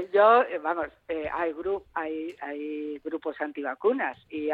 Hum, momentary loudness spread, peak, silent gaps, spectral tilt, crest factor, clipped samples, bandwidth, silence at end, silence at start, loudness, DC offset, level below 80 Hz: none; 14 LU; -10 dBFS; none; -6.5 dB/octave; 18 dB; under 0.1%; 4.8 kHz; 0 s; 0 s; -28 LUFS; under 0.1%; -62 dBFS